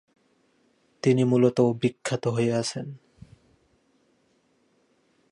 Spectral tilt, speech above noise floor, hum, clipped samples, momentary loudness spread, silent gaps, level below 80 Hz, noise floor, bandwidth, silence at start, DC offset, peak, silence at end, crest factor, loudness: -6.5 dB/octave; 44 dB; none; under 0.1%; 15 LU; none; -66 dBFS; -67 dBFS; 11.5 kHz; 1.05 s; under 0.1%; -8 dBFS; 2.35 s; 20 dB; -24 LUFS